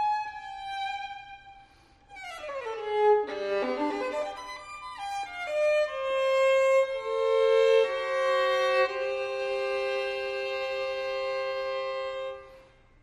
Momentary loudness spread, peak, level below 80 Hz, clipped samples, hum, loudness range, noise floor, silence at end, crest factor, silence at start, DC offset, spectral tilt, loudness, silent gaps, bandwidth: 16 LU; -12 dBFS; -64 dBFS; under 0.1%; none; 7 LU; -57 dBFS; 0.4 s; 16 dB; 0 s; under 0.1%; -2.5 dB/octave; -28 LUFS; none; 12 kHz